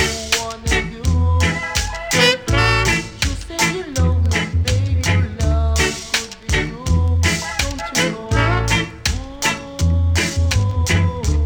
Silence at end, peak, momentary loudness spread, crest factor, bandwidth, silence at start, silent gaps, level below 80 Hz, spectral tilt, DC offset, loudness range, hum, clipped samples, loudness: 0 s; -2 dBFS; 6 LU; 16 dB; 19.5 kHz; 0 s; none; -24 dBFS; -4 dB/octave; under 0.1%; 2 LU; none; under 0.1%; -18 LUFS